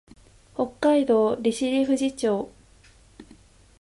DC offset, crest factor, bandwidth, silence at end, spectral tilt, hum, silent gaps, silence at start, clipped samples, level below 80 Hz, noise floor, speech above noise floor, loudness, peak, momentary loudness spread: under 0.1%; 14 dB; 11.5 kHz; 0.6 s; -5 dB/octave; none; none; 0.6 s; under 0.1%; -58 dBFS; -54 dBFS; 32 dB; -23 LUFS; -10 dBFS; 10 LU